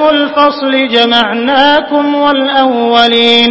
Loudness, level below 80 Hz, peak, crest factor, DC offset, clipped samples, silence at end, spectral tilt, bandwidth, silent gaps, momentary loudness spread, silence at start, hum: -8 LUFS; -48 dBFS; 0 dBFS; 8 dB; under 0.1%; 0.7%; 0 s; -4 dB/octave; 8 kHz; none; 4 LU; 0 s; none